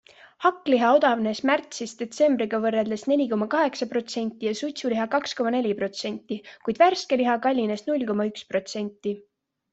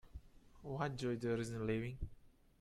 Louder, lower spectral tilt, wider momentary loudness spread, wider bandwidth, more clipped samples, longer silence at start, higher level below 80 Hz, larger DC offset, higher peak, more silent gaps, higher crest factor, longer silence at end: first, -25 LUFS vs -42 LUFS; second, -4.5 dB/octave vs -6.5 dB/octave; second, 12 LU vs 17 LU; second, 8.2 kHz vs 13 kHz; neither; first, 0.4 s vs 0.05 s; second, -70 dBFS vs -58 dBFS; neither; first, -6 dBFS vs -26 dBFS; neither; about the same, 18 dB vs 18 dB; first, 0.55 s vs 0.3 s